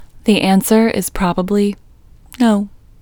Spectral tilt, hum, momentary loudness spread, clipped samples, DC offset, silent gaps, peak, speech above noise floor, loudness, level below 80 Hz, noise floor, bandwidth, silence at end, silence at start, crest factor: -5.5 dB/octave; none; 8 LU; under 0.1%; under 0.1%; none; 0 dBFS; 29 dB; -15 LUFS; -38 dBFS; -43 dBFS; over 20 kHz; 0.35 s; 0 s; 16 dB